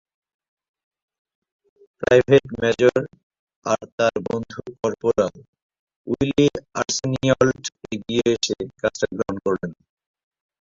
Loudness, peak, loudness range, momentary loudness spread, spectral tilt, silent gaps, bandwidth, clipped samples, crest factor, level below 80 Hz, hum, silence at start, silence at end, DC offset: -21 LUFS; -2 dBFS; 3 LU; 12 LU; -5 dB/octave; 3.23-3.30 s, 3.39-3.47 s, 3.56-3.62 s, 3.92-3.98 s, 5.48-5.53 s, 5.62-5.69 s, 5.79-5.87 s, 5.96-6.04 s; 7.8 kHz; under 0.1%; 20 dB; -52 dBFS; none; 2 s; 0.9 s; under 0.1%